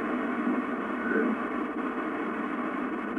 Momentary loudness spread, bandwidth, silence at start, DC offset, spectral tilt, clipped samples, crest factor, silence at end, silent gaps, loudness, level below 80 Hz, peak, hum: 4 LU; 10 kHz; 0 s; under 0.1%; -7 dB/octave; under 0.1%; 16 dB; 0 s; none; -30 LUFS; -64 dBFS; -14 dBFS; none